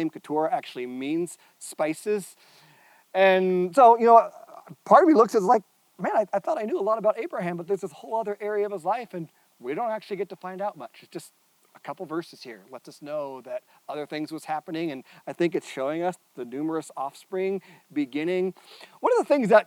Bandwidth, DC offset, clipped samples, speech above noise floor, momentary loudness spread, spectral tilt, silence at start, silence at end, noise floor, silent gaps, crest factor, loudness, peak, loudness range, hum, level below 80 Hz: 16.5 kHz; under 0.1%; under 0.1%; 32 dB; 22 LU; -6 dB/octave; 0 s; 0.05 s; -57 dBFS; none; 22 dB; -25 LUFS; -4 dBFS; 16 LU; none; -84 dBFS